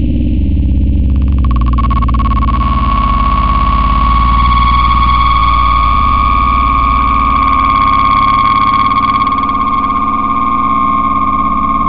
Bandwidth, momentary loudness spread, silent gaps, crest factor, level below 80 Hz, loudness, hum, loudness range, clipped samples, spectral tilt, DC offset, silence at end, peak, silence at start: 5.2 kHz; 4 LU; none; 8 dB; -14 dBFS; -10 LUFS; none; 3 LU; under 0.1%; -11 dB/octave; under 0.1%; 0 s; -2 dBFS; 0 s